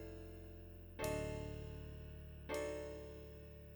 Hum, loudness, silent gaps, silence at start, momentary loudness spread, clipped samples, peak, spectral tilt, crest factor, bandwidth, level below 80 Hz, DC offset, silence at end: none; -48 LUFS; none; 0 s; 12 LU; under 0.1%; -28 dBFS; -5.5 dB/octave; 20 dB; over 20 kHz; -56 dBFS; under 0.1%; 0 s